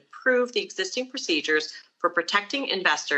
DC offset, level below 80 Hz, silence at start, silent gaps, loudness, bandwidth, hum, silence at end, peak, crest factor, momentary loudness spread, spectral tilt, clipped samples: under 0.1%; -90 dBFS; 0.15 s; none; -25 LUFS; 8.4 kHz; none; 0 s; -6 dBFS; 20 dB; 6 LU; -1.5 dB/octave; under 0.1%